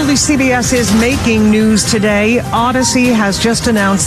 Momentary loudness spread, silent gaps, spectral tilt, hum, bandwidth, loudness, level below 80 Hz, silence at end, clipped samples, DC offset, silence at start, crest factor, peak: 2 LU; none; -4 dB/octave; none; 14 kHz; -11 LUFS; -30 dBFS; 0 s; under 0.1%; under 0.1%; 0 s; 10 dB; 0 dBFS